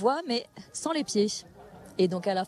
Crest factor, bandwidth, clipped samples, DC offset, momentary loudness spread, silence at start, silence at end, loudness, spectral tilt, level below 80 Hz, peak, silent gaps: 18 dB; 13 kHz; under 0.1%; under 0.1%; 13 LU; 0 s; 0 s; -29 LUFS; -4.5 dB/octave; -68 dBFS; -12 dBFS; none